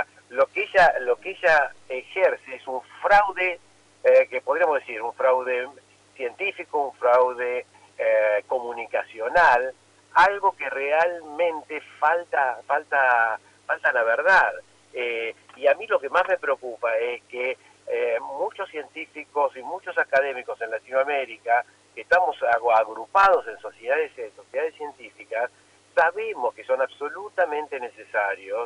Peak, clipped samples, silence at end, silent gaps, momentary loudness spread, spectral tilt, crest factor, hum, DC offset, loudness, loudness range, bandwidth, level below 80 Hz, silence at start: -8 dBFS; under 0.1%; 0 s; none; 14 LU; -3 dB/octave; 16 dB; 50 Hz at -65 dBFS; under 0.1%; -23 LUFS; 5 LU; 10.5 kHz; -60 dBFS; 0 s